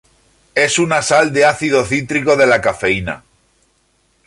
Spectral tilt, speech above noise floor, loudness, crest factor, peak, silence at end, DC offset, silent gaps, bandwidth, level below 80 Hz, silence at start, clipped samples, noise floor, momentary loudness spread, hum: -4 dB/octave; 46 dB; -14 LUFS; 16 dB; 0 dBFS; 1.1 s; under 0.1%; none; 11.5 kHz; -46 dBFS; 0.55 s; under 0.1%; -60 dBFS; 8 LU; none